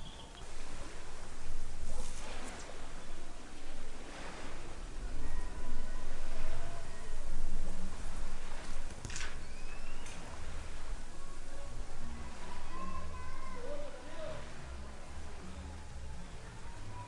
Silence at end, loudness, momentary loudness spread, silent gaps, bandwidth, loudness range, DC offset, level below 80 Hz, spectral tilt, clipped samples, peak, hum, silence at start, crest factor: 0 s; -47 LUFS; 6 LU; none; 10.5 kHz; 3 LU; under 0.1%; -38 dBFS; -4 dB/octave; under 0.1%; -18 dBFS; none; 0 s; 14 dB